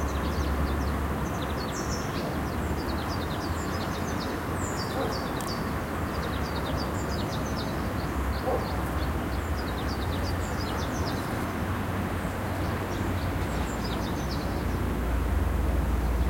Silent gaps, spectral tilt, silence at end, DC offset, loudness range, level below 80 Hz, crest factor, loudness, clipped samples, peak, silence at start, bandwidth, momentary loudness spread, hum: none; -5.5 dB/octave; 0 s; under 0.1%; 1 LU; -34 dBFS; 14 dB; -30 LUFS; under 0.1%; -16 dBFS; 0 s; 16.5 kHz; 2 LU; none